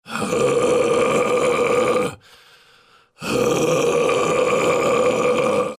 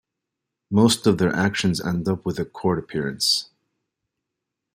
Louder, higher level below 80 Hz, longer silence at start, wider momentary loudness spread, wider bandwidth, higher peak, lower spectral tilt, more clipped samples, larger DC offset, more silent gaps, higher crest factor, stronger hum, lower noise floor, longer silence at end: first, -18 LUFS vs -22 LUFS; about the same, -52 dBFS vs -56 dBFS; second, 0.05 s vs 0.7 s; second, 4 LU vs 8 LU; about the same, 15.5 kHz vs 16 kHz; second, -8 dBFS vs -4 dBFS; about the same, -4 dB/octave vs -4.5 dB/octave; neither; neither; neither; second, 12 dB vs 20 dB; neither; second, -53 dBFS vs -83 dBFS; second, 0.05 s vs 1.3 s